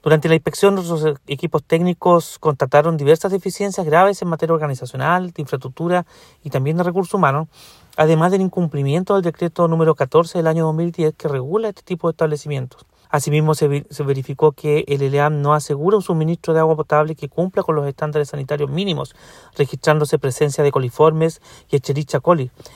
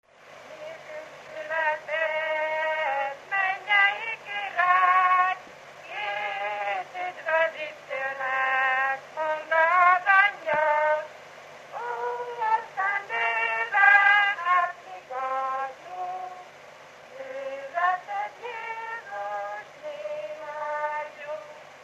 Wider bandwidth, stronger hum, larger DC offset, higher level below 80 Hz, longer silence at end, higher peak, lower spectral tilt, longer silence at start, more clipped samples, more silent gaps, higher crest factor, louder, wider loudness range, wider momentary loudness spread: first, 14.5 kHz vs 13 kHz; neither; neither; first, -56 dBFS vs -80 dBFS; about the same, 0.1 s vs 0 s; first, 0 dBFS vs -6 dBFS; first, -6.5 dB/octave vs -1.5 dB/octave; second, 0.05 s vs 0.25 s; neither; neither; about the same, 18 dB vs 20 dB; first, -18 LUFS vs -25 LUFS; second, 4 LU vs 10 LU; second, 8 LU vs 20 LU